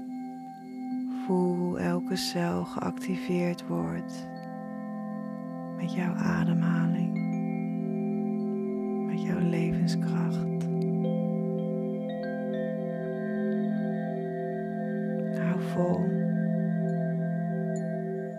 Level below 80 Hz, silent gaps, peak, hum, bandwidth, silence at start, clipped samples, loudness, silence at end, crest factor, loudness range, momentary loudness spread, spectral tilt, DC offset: -66 dBFS; none; -14 dBFS; none; 13 kHz; 0 s; under 0.1%; -30 LUFS; 0 s; 14 dB; 3 LU; 9 LU; -7.5 dB/octave; under 0.1%